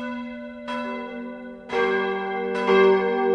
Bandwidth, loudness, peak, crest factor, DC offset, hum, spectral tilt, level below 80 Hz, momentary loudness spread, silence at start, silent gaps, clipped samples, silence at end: 7.8 kHz; -23 LUFS; -6 dBFS; 16 dB; under 0.1%; none; -6 dB/octave; -60 dBFS; 18 LU; 0 s; none; under 0.1%; 0 s